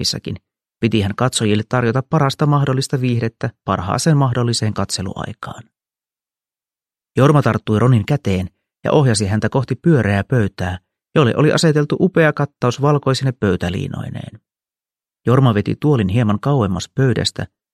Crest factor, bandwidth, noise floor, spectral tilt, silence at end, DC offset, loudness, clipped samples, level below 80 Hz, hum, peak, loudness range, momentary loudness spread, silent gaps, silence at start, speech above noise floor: 16 dB; 13 kHz; under -90 dBFS; -6 dB/octave; 0.3 s; under 0.1%; -17 LUFS; under 0.1%; -48 dBFS; none; 0 dBFS; 4 LU; 12 LU; none; 0 s; over 74 dB